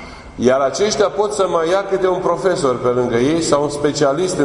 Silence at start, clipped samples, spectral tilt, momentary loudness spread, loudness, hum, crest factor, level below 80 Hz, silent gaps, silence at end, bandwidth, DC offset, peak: 0 s; under 0.1%; -4.5 dB/octave; 2 LU; -16 LUFS; none; 16 dB; -44 dBFS; none; 0 s; 11 kHz; under 0.1%; 0 dBFS